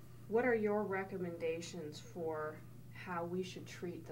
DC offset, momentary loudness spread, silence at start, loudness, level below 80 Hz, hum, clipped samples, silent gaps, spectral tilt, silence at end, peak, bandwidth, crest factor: under 0.1%; 14 LU; 0 s; -40 LUFS; -70 dBFS; none; under 0.1%; none; -6 dB/octave; 0 s; -24 dBFS; 16.5 kHz; 16 dB